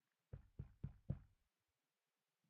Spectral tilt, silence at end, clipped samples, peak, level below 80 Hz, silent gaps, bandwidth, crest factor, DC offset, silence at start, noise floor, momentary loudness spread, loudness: -11.5 dB/octave; 1.2 s; under 0.1%; -32 dBFS; -66 dBFS; none; 3.9 kHz; 26 dB; under 0.1%; 0.35 s; under -90 dBFS; 10 LU; -56 LUFS